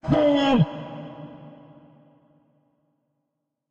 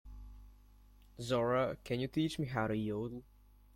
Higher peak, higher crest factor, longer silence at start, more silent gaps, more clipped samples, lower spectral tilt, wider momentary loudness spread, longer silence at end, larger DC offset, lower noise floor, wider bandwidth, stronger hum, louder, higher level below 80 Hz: first, -8 dBFS vs -20 dBFS; about the same, 18 dB vs 18 dB; about the same, 0.05 s vs 0.05 s; neither; neither; about the same, -7.5 dB/octave vs -6.5 dB/octave; first, 23 LU vs 20 LU; first, 2.2 s vs 0.55 s; neither; first, -80 dBFS vs -61 dBFS; second, 7.4 kHz vs 16.5 kHz; second, none vs 50 Hz at -60 dBFS; first, -21 LUFS vs -36 LUFS; first, -52 dBFS vs -58 dBFS